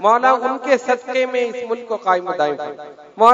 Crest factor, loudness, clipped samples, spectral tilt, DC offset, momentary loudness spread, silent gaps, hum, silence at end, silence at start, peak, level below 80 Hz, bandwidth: 18 dB; -18 LUFS; 0.1%; -4 dB/octave; under 0.1%; 13 LU; none; none; 0 s; 0 s; 0 dBFS; -68 dBFS; 9 kHz